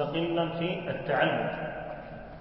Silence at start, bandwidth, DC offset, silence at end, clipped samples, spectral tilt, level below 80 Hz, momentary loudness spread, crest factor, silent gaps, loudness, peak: 0 s; 5.8 kHz; under 0.1%; 0 s; under 0.1%; -10 dB/octave; -54 dBFS; 14 LU; 18 dB; none; -30 LUFS; -12 dBFS